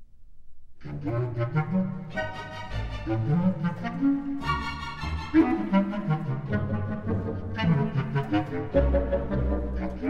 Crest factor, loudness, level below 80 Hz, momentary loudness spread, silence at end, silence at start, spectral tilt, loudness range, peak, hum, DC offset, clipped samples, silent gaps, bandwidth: 18 dB; -28 LUFS; -38 dBFS; 9 LU; 0 s; 0 s; -8.5 dB/octave; 3 LU; -10 dBFS; none; under 0.1%; under 0.1%; none; 8.4 kHz